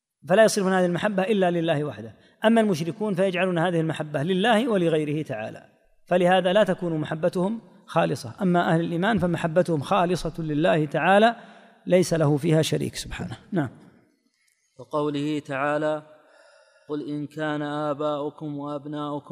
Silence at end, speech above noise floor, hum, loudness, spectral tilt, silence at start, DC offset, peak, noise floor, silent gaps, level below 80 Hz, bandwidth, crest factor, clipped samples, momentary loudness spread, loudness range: 0 s; 45 dB; none; -24 LUFS; -6 dB/octave; 0.25 s; under 0.1%; -6 dBFS; -68 dBFS; none; -54 dBFS; 15.5 kHz; 18 dB; under 0.1%; 13 LU; 7 LU